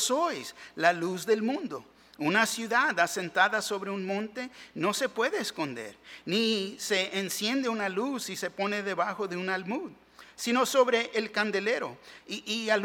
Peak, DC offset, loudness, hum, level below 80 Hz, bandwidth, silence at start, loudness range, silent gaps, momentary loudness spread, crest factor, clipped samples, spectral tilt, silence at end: -6 dBFS; under 0.1%; -29 LUFS; none; -74 dBFS; 17.5 kHz; 0 s; 3 LU; none; 13 LU; 22 dB; under 0.1%; -3 dB/octave; 0 s